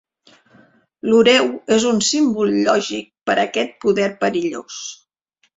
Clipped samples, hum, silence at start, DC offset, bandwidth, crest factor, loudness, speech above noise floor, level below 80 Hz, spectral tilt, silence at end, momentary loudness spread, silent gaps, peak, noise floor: under 0.1%; none; 1.05 s; under 0.1%; 8 kHz; 18 dB; -17 LUFS; 48 dB; -60 dBFS; -3.5 dB/octave; 0.65 s; 14 LU; none; -2 dBFS; -66 dBFS